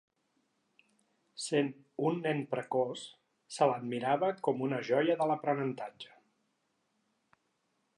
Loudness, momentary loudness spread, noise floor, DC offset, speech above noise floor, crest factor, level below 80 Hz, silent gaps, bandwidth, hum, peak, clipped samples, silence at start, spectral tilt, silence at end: -33 LUFS; 15 LU; -79 dBFS; under 0.1%; 46 dB; 22 dB; -88 dBFS; none; 11.5 kHz; none; -14 dBFS; under 0.1%; 1.35 s; -5.5 dB/octave; 1.9 s